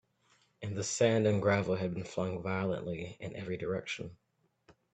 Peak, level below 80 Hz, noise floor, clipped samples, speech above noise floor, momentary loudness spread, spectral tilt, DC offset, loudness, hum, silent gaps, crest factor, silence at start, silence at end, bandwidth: -14 dBFS; -68 dBFS; -71 dBFS; under 0.1%; 38 dB; 13 LU; -5.5 dB/octave; under 0.1%; -34 LUFS; none; none; 20 dB; 0.6 s; 0.8 s; 9.2 kHz